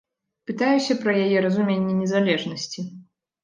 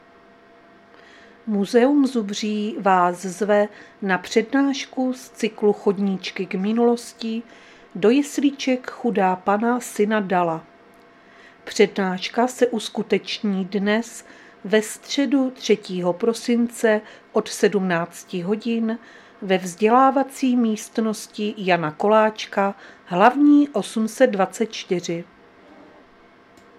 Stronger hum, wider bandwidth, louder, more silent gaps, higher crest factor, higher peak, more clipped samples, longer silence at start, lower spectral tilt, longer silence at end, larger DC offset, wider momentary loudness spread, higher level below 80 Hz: neither; second, 9.2 kHz vs 14.5 kHz; about the same, -22 LUFS vs -21 LUFS; neither; second, 16 dB vs 22 dB; second, -8 dBFS vs 0 dBFS; neither; second, 0.5 s vs 1.45 s; about the same, -5.5 dB/octave vs -5 dB/octave; second, 0.4 s vs 1.55 s; neither; first, 14 LU vs 10 LU; about the same, -68 dBFS vs -70 dBFS